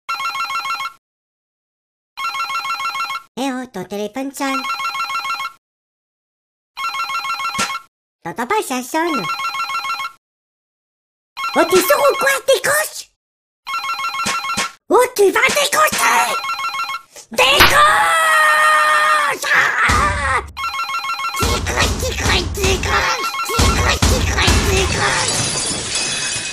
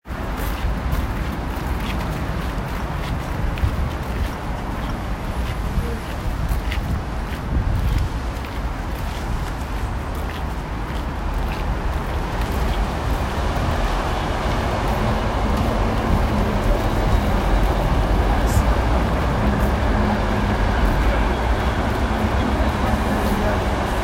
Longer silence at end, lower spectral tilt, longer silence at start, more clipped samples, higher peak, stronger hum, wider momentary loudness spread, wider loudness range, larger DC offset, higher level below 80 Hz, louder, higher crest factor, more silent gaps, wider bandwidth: about the same, 0 s vs 0 s; second, -2.5 dB/octave vs -6.5 dB/octave; about the same, 0.1 s vs 0.05 s; neither; first, 0 dBFS vs -4 dBFS; neither; first, 13 LU vs 7 LU; first, 11 LU vs 6 LU; first, 0.2% vs under 0.1%; second, -30 dBFS vs -24 dBFS; first, -16 LUFS vs -23 LUFS; about the same, 18 dB vs 16 dB; first, 0.98-2.16 s, 3.28-3.35 s, 5.58-6.74 s, 7.88-8.19 s, 10.18-11.36 s, 13.16-13.63 s vs none; about the same, 15.5 kHz vs 16 kHz